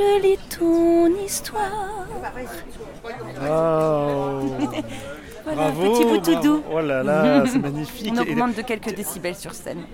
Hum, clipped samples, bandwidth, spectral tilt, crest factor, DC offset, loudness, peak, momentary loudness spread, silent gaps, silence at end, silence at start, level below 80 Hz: none; under 0.1%; 17 kHz; -5.5 dB/octave; 18 dB; under 0.1%; -21 LUFS; -4 dBFS; 16 LU; none; 0 s; 0 s; -44 dBFS